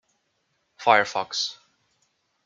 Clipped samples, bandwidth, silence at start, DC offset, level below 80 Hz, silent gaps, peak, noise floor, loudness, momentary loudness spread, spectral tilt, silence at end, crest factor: under 0.1%; 7.6 kHz; 0.8 s; under 0.1%; -78 dBFS; none; -2 dBFS; -73 dBFS; -23 LUFS; 9 LU; -1.5 dB/octave; 0.95 s; 24 dB